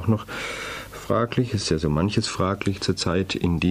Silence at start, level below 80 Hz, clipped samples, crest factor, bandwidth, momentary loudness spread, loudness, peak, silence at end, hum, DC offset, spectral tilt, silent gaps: 0 s; -42 dBFS; under 0.1%; 14 dB; 15.5 kHz; 8 LU; -24 LUFS; -10 dBFS; 0 s; none; under 0.1%; -5.5 dB/octave; none